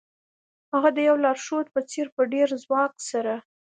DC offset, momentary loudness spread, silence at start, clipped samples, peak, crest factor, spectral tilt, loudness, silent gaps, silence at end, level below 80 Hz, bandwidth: under 0.1%; 8 LU; 0.75 s; under 0.1%; -6 dBFS; 20 dB; -3.5 dB/octave; -24 LUFS; 2.12-2.17 s; 0.3 s; -80 dBFS; 9.4 kHz